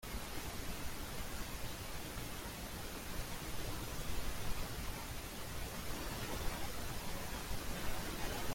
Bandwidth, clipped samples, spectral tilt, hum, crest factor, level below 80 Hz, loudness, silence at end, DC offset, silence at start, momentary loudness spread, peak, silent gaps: 16.5 kHz; under 0.1%; -3.5 dB/octave; none; 16 dB; -48 dBFS; -44 LUFS; 0 s; under 0.1%; 0 s; 3 LU; -24 dBFS; none